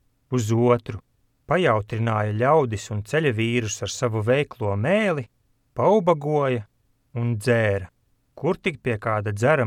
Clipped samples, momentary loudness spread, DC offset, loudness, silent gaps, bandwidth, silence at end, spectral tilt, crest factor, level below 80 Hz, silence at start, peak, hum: under 0.1%; 10 LU; under 0.1%; -23 LUFS; none; 13.5 kHz; 0 s; -6 dB/octave; 18 dB; -56 dBFS; 0.3 s; -6 dBFS; none